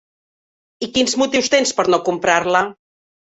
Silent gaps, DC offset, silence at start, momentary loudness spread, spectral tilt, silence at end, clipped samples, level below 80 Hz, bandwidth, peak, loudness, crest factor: none; under 0.1%; 0.8 s; 6 LU; -2.5 dB/octave; 0.6 s; under 0.1%; -56 dBFS; 8.4 kHz; -2 dBFS; -17 LUFS; 18 dB